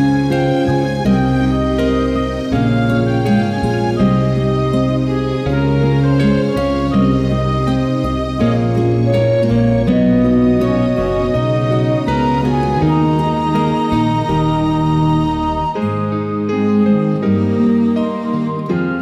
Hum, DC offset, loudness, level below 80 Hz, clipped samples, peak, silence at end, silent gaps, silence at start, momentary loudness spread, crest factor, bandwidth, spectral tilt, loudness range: none; under 0.1%; -15 LUFS; -30 dBFS; under 0.1%; -4 dBFS; 0 s; none; 0 s; 5 LU; 10 dB; 11 kHz; -8.5 dB/octave; 2 LU